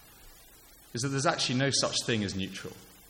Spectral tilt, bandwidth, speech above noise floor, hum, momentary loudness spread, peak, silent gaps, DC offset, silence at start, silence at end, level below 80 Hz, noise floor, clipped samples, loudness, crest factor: -3.5 dB/octave; 17 kHz; 25 dB; none; 14 LU; -12 dBFS; none; under 0.1%; 0.05 s; 0.15 s; -60 dBFS; -55 dBFS; under 0.1%; -29 LUFS; 20 dB